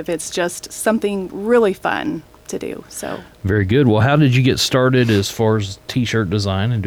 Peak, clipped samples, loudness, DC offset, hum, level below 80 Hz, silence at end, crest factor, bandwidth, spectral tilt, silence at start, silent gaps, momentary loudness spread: -4 dBFS; under 0.1%; -17 LUFS; under 0.1%; none; -46 dBFS; 0 s; 12 dB; 18 kHz; -5.5 dB/octave; 0 s; none; 14 LU